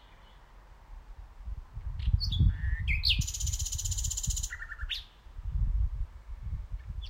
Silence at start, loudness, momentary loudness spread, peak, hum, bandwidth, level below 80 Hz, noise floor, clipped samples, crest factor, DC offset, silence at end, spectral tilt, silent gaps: 0.05 s; -33 LUFS; 18 LU; -12 dBFS; none; 16.5 kHz; -34 dBFS; -54 dBFS; under 0.1%; 20 dB; under 0.1%; 0 s; -2 dB/octave; none